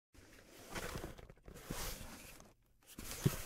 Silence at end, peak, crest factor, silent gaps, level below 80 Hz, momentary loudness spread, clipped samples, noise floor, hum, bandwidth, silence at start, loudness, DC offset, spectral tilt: 0 s; -20 dBFS; 26 dB; none; -56 dBFS; 19 LU; under 0.1%; -65 dBFS; none; 16 kHz; 0.15 s; -46 LUFS; under 0.1%; -4.5 dB/octave